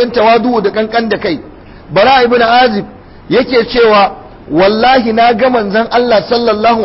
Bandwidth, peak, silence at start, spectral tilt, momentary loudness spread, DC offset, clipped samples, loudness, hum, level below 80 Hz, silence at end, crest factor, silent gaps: 5.8 kHz; 0 dBFS; 0 s; -9 dB/octave; 8 LU; under 0.1%; under 0.1%; -10 LUFS; none; -40 dBFS; 0 s; 10 dB; none